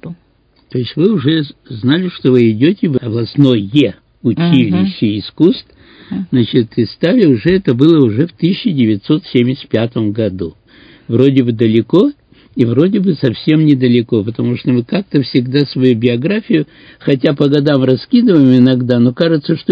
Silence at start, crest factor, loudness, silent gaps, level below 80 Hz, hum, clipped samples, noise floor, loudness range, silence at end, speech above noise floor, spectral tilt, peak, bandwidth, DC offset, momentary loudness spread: 0.05 s; 12 dB; -12 LUFS; none; -48 dBFS; none; 0.2%; -53 dBFS; 3 LU; 0 s; 41 dB; -9.5 dB/octave; 0 dBFS; 5.2 kHz; under 0.1%; 8 LU